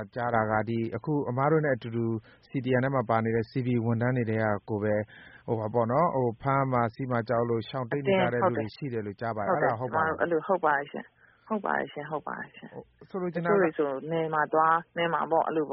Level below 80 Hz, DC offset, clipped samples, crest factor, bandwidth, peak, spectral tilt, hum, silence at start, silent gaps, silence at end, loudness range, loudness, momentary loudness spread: -62 dBFS; under 0.1%; under 0.1%; 18 dB; 5.4 kHz; -10 dBFS; -6 dB/octave; none; 0 s; none; 0 s; 3 LU; -28 LUFS; 10 LU